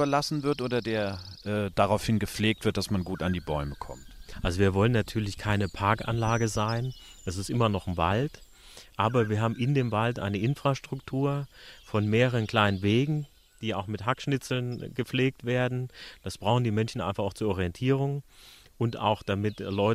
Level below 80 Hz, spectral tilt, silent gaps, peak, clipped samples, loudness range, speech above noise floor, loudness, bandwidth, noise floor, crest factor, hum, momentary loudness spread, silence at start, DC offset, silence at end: -48 dBFS; -6 dB/octave; none; -8 dBFS; under 0.1%; 2 LU; 23 dB; -28 LUFS; 15 kHz; -51 dBFS; 20 dB; none; 10 LU; 0 s; under 0.1%; 0 s